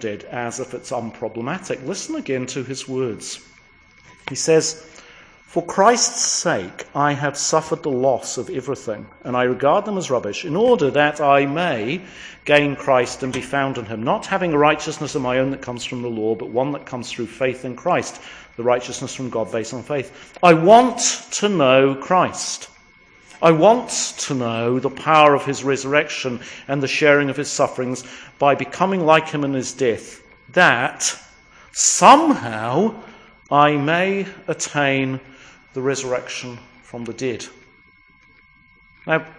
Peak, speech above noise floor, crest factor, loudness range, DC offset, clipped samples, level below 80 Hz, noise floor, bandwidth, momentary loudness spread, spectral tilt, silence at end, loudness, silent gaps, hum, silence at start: 0 dBFS; 33 dB; 20 dB; 8 LU; under 0.1%; under 0.1%; -58 dBFS; -52 dBFS; 10.5 kHz; 15 LU; -3.5 dB/octave; 0.05 s; -19 LUFS; none; none; 0 s